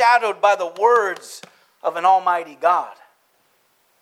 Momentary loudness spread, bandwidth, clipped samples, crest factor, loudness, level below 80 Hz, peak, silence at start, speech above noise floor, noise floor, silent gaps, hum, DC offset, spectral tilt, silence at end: 17 LU; 14.5 kHz; under 0.1%; 18 dB; -18 LUFS; under -90 dBFS; -2 dBFS; 0 s; 43 dB; -62 dBFS; none; none; under 0.1%; -2 dB/octave; 1.1 s